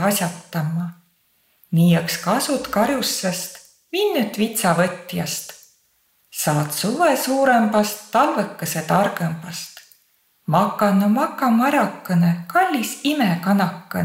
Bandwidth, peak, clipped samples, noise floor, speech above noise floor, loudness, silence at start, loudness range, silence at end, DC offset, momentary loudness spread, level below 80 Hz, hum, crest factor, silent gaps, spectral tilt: 16.5 kHz; -4 dBFS; under 0.1%; -63 dBFS; 43 dB; -20 LUFS; 0 s; 3 LU; 0 s; under 0.1%; 11 LU; -62 dBFS; none; 18 dB; none; -5 dB/octave